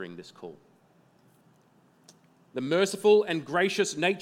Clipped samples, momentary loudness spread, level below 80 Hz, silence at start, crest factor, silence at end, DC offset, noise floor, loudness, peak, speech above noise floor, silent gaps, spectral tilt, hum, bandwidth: under 0.1%; 23 LU; -84 dBFS; 0 s; 20 dB; 0 s; under 0.1%; -62 dBFS; -25 LUFS; -10 dBFS; 36 dB; none; -4 dB/octave; none; 14.5 kHz